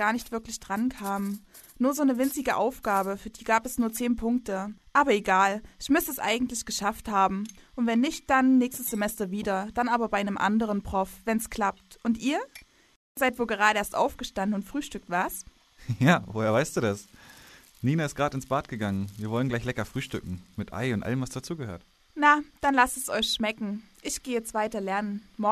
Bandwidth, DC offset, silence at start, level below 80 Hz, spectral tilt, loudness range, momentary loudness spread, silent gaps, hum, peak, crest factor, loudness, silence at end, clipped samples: 14 kHz; under 0.1%; 0 s; -52 dBFS; -4.5 dB/octave; 4 LU; 12 LU; 12.96-13.15 s; none; -6 dBFS; 22 dB; -27 LUFS; 0 s; under 0.1%